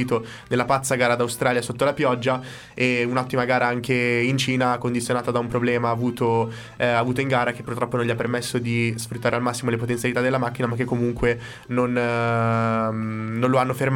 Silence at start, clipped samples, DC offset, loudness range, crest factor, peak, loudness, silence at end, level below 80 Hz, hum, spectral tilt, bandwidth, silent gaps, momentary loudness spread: 0 s; under 0.1%; under 0.1%; 2 LU; 16 dB; -6 dBFS; -23 LUFS; 0 s; -50 dBFS; none; -5.5 dB/octave; 16.5 kHz; none; 5 LU